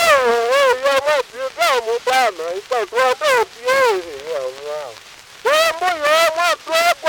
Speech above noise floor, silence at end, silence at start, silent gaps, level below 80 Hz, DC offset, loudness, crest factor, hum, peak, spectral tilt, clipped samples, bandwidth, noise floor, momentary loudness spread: 23 dB; 0 s; 0 s; none; -58 dBFS; under 0.1%; -17 LUFS; 16 dB; none; 0 dBFS; -0.5 dB/octave; under 0.1%; 18 kHz; -40 dBFS; 12 LU